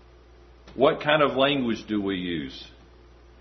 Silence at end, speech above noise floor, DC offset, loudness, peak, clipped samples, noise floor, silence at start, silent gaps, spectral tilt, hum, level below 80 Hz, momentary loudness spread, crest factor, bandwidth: 0.75 s; 27 dB; under 0.1%; -24 LUFS; -4 dBFS; under 0.1%; -51 dBFS; 0.65 s; none; -6.5 dB/octave; 60 Hz at -50 dBFS; -52 dBFS; 17 LU; 22 dB; 6.4 kHz